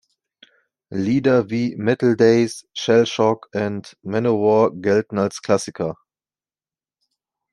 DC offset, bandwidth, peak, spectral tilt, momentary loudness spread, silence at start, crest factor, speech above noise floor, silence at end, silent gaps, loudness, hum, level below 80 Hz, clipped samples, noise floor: under 0.1%; 11.5 kHz; -2 dBFS; -6 dB/octave; 11 LU; 0.9 s; 18 dB; over 71 dB; 1.6 s; none; -19 LUFS; none; -62 dBFS; under 0.1%; under -90 dBFS